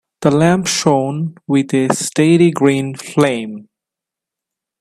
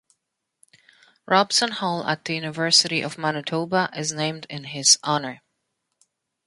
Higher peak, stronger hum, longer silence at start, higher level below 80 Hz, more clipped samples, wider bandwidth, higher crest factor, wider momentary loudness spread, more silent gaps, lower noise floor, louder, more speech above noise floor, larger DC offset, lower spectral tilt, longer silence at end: about the same, 0 dBFS vs -2 dBFS; neither; second, 0.2 s vs 1.3 s; first, -56 dBFS vs -70 dBFS; neither; first, 14 kHz vs 11.5 kHz; second, 16 dB vs 22 dB; about the same, 11 LU vs 11 LU; neither; first, -85 dBFS vs -79 dBFS; first, -15 LUFS vs -21 LUFS; first, 70 dB vs 56 dB; neither; first, -5.5 dB/octave vs -2 dB/octave; about the same, 1.2 s vs 1.1 s